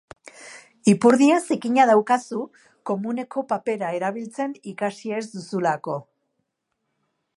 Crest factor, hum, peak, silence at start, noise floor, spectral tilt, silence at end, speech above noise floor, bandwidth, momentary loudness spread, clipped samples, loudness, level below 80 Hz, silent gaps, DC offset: 20 dB; none; -2 dBFS; 0.25 s; -77 dBFS; -5.5 dB/octave; 1.35 s; 56 dB; 11.5 kHz; 17 LU; under 0.1%; -22 LUFS; -72 dBFS; none; under 0.1%